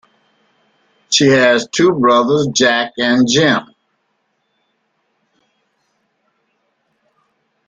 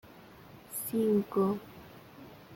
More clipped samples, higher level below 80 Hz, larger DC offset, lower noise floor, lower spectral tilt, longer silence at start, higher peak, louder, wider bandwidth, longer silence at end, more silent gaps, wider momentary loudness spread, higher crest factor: neither; first, -56 dBFS vs -68 dBFS; neither; first, -66 dBFS vs -53 dBFS; second, -3.5 dB/octave vs -6.5 dB/octave; first, 1.1 s vs 0.05 s; first, 0 dBFS vs -18 dBFS; first, -13 LUFS vs -31 LUFS; second, 9.6 kHz vs 17 kHz; first, 4.05 s vs 0 s; neither; second, 5 LU vs 24 LU; about the same, 16 dB vs 16 dB